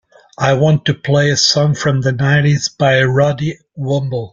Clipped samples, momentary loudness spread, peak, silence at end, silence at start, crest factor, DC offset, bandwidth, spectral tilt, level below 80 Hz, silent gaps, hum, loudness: under 0.1%; 7 LU; 0 dBFS; 0.05 s; 0.4 s; 14 dB; under 0.1%; 7.6 kHz; -5 dB/octave; -48 dBFS; none; none; -14 LUFS